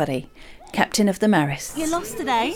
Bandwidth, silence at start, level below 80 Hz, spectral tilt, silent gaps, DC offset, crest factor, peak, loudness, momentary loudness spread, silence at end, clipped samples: 18.5 kHz; 0 s; -48 dBFS; -4.5 dB/octave; none; under 0.1%; 18 dB; -4 dBFS; -22 LUFS; 8 LU; 0 s; under 0.1%